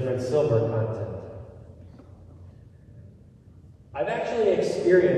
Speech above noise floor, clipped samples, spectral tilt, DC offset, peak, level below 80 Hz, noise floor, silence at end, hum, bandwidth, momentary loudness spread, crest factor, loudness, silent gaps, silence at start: 27 dB; under 0.1%; -7.5 dB/octave; under 0.1%; -8 dBFS; -52 dBFS; -50 dBFS; 0 s; none; 10 kHz; 25 LU; 20 dB; -25 LUFS; none; 0 s